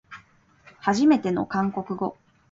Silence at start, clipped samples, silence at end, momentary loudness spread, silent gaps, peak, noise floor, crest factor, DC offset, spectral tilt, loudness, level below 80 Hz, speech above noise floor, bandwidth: 0.1 s; under 0.1%; 0.4 s; 11 LU; none; -8 dBFS; -56 dBFS; 18 dB; under 0.1%; -6.5 dB/octave; -24 LUFS; -62 dBFS; 34 dB; 7.8 kHz